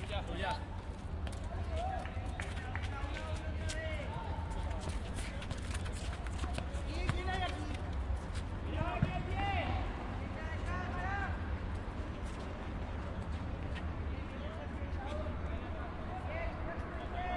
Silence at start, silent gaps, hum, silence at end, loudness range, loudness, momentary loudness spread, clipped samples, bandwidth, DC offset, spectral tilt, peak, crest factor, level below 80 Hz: 0 s; none; none; 0 s; 4 LU; -40 LUFS; 6 LU; under 0.1%; 11.5 kHz; under 0.1%; -6 dB/octave; -16 dBFS; 22 dB; -42 dBFS